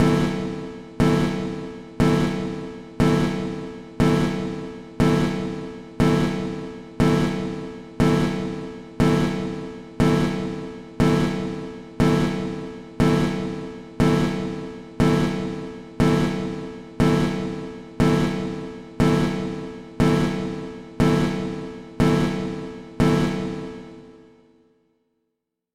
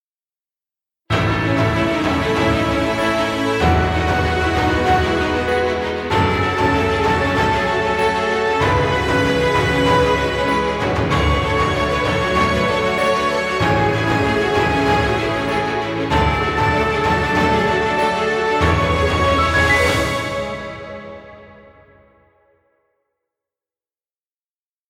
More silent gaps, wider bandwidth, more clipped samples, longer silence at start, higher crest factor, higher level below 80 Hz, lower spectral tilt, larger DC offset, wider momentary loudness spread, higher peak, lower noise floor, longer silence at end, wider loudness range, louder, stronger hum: neither; second, 14.5 kHz vs 16.5 kHz; neither; second, 0 s vs 1.1 s; about the same, 16 dB vs 16 dB; second, -38 dBFS vs -32 dBFS; first, -7 dB/octave vs -5.5 dB/octave; neither; first, 16 LU vs 4 LU; second, -8 dBFS vs -2 dBFS; second, -79 dBFS vs under -90 dBFS; second, 1.55 s vs 3.35 s; about the same, 0 LU vs 2 LU; second, -23 LUFS vs -17 LUFS; neither